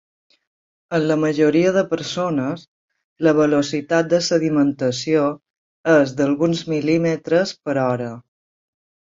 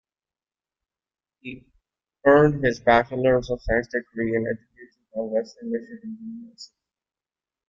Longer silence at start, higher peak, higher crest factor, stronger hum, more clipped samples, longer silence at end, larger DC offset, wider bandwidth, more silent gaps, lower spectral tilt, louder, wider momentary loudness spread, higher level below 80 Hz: second, 0.9 s vs 1.45 s; about the same, -2 dBFS vs -4 dBFS; about the same, 18 dB vs 22 dB; neither; neither; about the same, 1 s vs 1.05 s; neither; about the same, 7.8 kHz vs 7.6 kHz; first, 2.68-2.88 s, 3.04-3.16 s, 5.50-5.84 s vs none; second, -5.5 dB/octave vs -7 dB/octave; first, -19 LUFS vs -22 LUFS; second, 8 LU vs 22 LU; second, -62 dBFS vs -46 dBFS